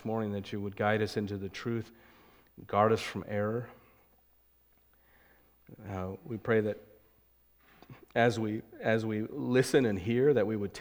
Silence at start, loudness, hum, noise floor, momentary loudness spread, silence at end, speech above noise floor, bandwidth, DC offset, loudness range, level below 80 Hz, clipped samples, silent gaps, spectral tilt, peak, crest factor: 0 s; -31 LUFS; none; -67 dBFS; 12 LU; 0 s; 36 dB; 17.5 kHz; under 0.1%; 8 LU; -66 dBFS; under 0.1%; none; -6.5 dB/octave; -12 dBFS; 22 dB